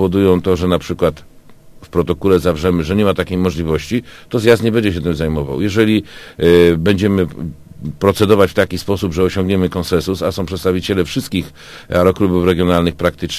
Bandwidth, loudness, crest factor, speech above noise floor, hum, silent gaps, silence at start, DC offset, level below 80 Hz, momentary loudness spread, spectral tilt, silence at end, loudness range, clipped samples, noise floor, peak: 15.5 kHz; -15 LUFS; 14 dB; 25 dB; none; none; 0 s; under 0.1%; -32 dBFS; 9 LU; -6.5 dB/octave; 0 s; 3 LU; under 0.1%; -39 dBFS; 0 dBFS